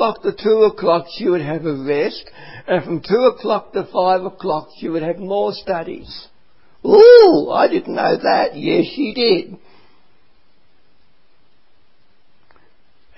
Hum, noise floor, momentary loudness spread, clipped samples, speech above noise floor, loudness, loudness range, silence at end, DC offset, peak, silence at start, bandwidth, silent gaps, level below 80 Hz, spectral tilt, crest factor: none; -61 dBFS; 14 LU; under 0.1%; 46 dB; -15 LUFS; 9 LU; 3.6 s; 0.7%; 0 dBFS; 0 s; 5.8 kHz; none; -56 dBFS; -8 dB/octave; 16 dB